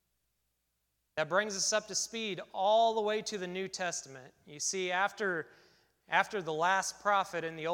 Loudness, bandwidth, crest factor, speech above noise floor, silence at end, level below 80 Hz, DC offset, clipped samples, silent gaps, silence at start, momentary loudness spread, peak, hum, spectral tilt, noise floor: -32 LUFS; 17 kHz; 22 dB; 48 dB; 0 s; -76 dBFS; under 0.1%; under 0.1%; none; 1.15 s; 10 LU; -12 dBFS; none; -2 dB/octave; -81 dBFS